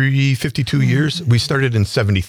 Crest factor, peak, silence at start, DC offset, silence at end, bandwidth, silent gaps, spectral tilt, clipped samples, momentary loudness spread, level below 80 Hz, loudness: 10 dB; -6 dBFS; 0 s; under 0.1%; 0 s; 15 kHz; none; -6 dB/octave; under 0.1%; 2 LU; -44 dBFS; -17 LUFS